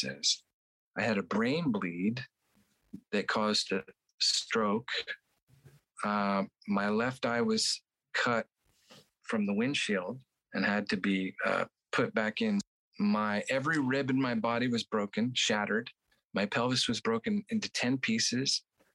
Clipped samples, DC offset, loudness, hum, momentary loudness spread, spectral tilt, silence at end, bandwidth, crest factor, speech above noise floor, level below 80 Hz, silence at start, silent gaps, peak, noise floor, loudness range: under 0.1%; under 0.1%; -31 LUFS; none; 8 LU; -3.5 dB/octave; 0.35 s; 12 kHz; 18 dB; 41 dB; -74 dBFS; 0 s; 0.54-0.91 s, 4.14-4.18 s, 5.43-5.47 s, 12.67-12.92 s; -14 dBFS; -72 dBFS; 2 LU